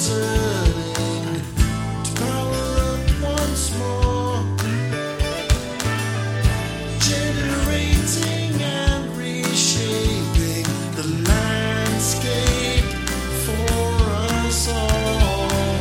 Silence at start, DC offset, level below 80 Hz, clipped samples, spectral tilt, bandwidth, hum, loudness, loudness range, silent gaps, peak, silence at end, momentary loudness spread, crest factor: 0 s; under 0.1%; -26 dBFS; under 0.1%; -4.5 dB/octave; 17 kHz; none; -21 LUFS; 2 LU; none; -4 dBFS; 0 s; 5 LU; 16 dB